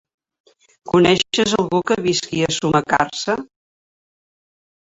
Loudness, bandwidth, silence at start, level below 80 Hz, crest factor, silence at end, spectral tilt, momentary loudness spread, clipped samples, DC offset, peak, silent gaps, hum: -18 LUFS; 8 kHz; 0.85 s; -52 dBFS; 18 dB; 1.45 s; -4 dB/octave; 7 LU; under 0.1%; under 0.1%; -2 dBFS; none; none